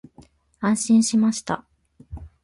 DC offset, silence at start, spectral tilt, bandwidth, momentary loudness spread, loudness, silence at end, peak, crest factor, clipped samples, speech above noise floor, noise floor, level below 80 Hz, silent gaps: under 0.1%; 0.6 s; -4.5 dB/octave; 11.5 kHz; 23 LU; -21 LUFS; 0.15 s; -8 dBFS; 14 dB; under 0.1%; 33 dB; -53 dBFS; -48 dBFS; none